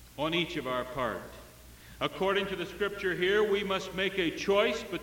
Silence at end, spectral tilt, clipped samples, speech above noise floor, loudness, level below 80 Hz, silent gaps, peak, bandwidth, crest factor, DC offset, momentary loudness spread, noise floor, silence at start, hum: 0 s; -4.5 dB/octave; under 0.1%; 21 dB; -30 LUFS; -56 dBFS; none; -14 dBFS; 17 kHz; 18 dB; under 0.1%; 8 LU; -52 dBFS; 0 s; none